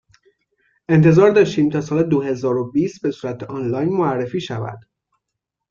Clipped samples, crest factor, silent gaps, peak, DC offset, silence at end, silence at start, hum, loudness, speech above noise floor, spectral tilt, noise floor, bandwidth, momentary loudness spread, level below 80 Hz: under 0.1%; 16 dB; none; -2 dBFS; under 0.1%; 0.9 s; 0.9 s; none; -18 LUFS; 64 dB; -8 dB/octave; -81 dBFS; 7.2 kHz; 15 LU; -56 dBFS